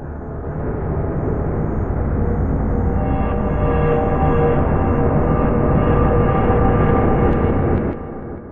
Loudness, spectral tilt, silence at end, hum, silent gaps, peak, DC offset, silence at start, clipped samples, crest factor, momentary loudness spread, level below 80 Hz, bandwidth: -18 LUFS; -9 dB/octave; 0 s; none; none; -2 dBFS; under 0.1%; 0 s; under 0.1%; 14 dB; 9 LU; -24 dBFS; 3.5 kHz